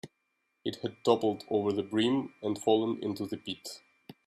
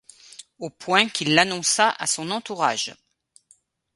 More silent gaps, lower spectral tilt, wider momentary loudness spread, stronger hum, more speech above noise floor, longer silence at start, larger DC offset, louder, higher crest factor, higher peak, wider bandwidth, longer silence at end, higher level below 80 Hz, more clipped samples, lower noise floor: neither; first, -5.5 dB/octave vs -2 dB/octave; second, 12 LU vs 17 LU; neither; first, 49 dB vs 39 dB; second, 0.05 s vs 0.6 s; neither; second, -31 LUFS vs -21 LUFS; about the same, 22 dB vs 24 dB; second, -10 dBFS vs 0 dBFS; first, 14 kHz vs 12 kHz; second, 0.15 s vs 1 s; second, -74 dBFS vs -68 dBFS; neither; first, -79 dBFS vs -61 dBFS